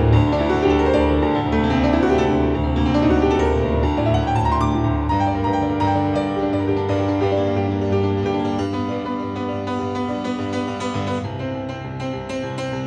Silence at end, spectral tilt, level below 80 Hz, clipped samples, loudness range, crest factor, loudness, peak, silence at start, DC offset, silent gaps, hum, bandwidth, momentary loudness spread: 0 s; -7.5 dB/octave; -30 dBFS; under 0.1%; 7 LU; 14 dB; -20 LUFS; -4 dBFS; 0 s; under 0.1%; none; none; 9.2 kHz; 9 LU